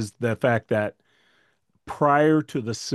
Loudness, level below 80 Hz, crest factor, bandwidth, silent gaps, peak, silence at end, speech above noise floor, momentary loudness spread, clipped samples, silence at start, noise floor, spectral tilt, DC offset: -23 LUFS; -64 dBFS; 18 dB; 12.5 kHz; none; -6 dBFS; 0 s; 44 dB; 11 LU; under 0.1%; 0 s; -67 dBFS; -6 dB/octave; under 0.1%